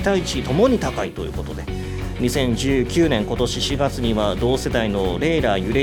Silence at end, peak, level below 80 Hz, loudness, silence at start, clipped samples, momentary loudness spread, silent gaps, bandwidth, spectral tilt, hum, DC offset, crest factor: 0 s; -4 dBFS; -32 dBFS; -21 LUFS; 0 s; under 0.1%; 10 LU; none; 19 kHz; -5.5 dB/octave; none; under 0.1%; 16 dB